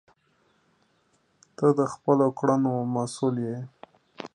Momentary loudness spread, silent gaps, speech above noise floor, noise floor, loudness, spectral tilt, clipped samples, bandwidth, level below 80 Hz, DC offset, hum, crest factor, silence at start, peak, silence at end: 13 LU; none; 43 dB; -68 dBFS; -25 LUFS; -7.5 dB/octave; under 0.1%; 11 kHz; -72 dBFS; under 0.1%; none; 20 dB; 1.6 s; -8 dBFS; 0.05 s